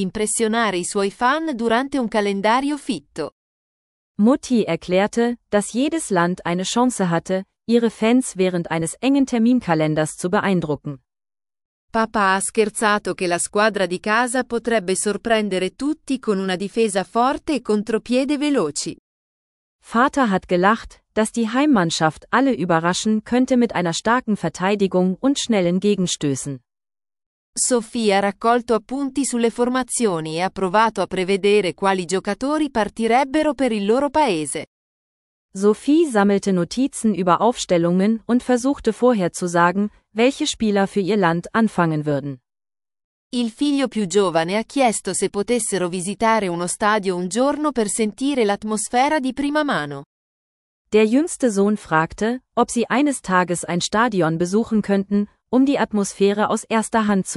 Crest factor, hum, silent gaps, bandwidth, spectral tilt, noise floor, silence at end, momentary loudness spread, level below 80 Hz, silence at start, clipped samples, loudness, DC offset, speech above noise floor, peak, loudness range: 18 dB; none; 3.32-4.15 s, 11.65-11.88 s, 18.99-19.79 s, 27.26-27.53 s, 34.67-35.49 s, 43.04-43.30 s, 50.06-50.85 s; 13.5 kHz; -4.5 dB/octave; under -90 dBFS; 0 s; 6 LU; -54 dBFS; 0 s; under 0.1%; -20 LUFS; under 0.1%; over 71 dB; -2 dBFS; 3 LU